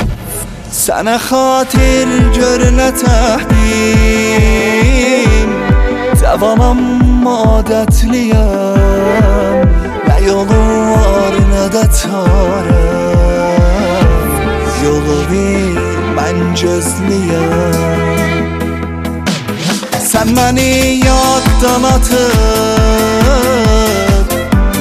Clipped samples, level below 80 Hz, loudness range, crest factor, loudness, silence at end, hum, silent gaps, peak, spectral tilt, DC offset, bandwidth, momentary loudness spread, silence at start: under 0.1%; -14 dBFS; 3 LU; 10 dB; -11 LUFS; 0 s; none; none; 0 dBFS; -5.5 dB/octave; under 0.1%; 15.5 kHz; 5 LU; 0 s